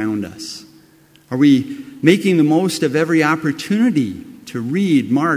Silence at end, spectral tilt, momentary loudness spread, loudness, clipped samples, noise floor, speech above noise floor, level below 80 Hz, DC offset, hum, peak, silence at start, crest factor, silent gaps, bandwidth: 0 s; -6 dB/octave; 16 LU; -16 LUFS; under 0.1%; -50 dBFS; 34 dB; -56 dBFS; under 0.1%; none; 0 dBFS; 0 s; 16 dB; none; 16 kHz